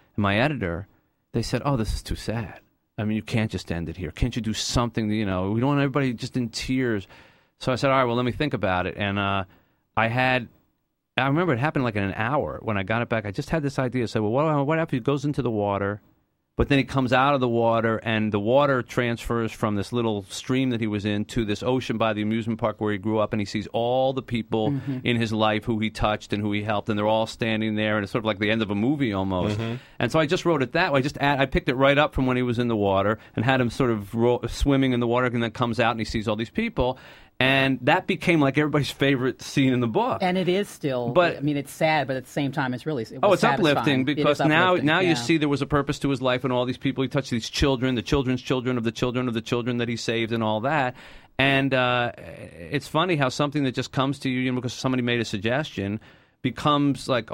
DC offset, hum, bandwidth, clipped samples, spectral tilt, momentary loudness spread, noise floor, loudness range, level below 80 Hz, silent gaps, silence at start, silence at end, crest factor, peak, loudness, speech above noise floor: under 0.1%; none; 16 kHz; under 0.1%; -6 dB/octave; 8 LU; -74 dBFS; 4 LU; -44 dBFS; none; 0.15 s; 0 s; 22 dB; -2 dBFS; -24 LUFS; 50 dB